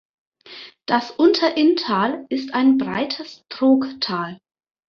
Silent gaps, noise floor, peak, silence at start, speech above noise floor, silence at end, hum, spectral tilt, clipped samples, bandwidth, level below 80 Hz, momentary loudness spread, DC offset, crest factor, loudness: none; -42 dBFS; -4 dBFS; 0.5 s; 23 dB; 0.55 s; none; -5.5 dB/octave; under 0.1%; 6.8 kHz; -64 dBFS; 18 LU; under 0.1%; 18 dB; -19 LUFS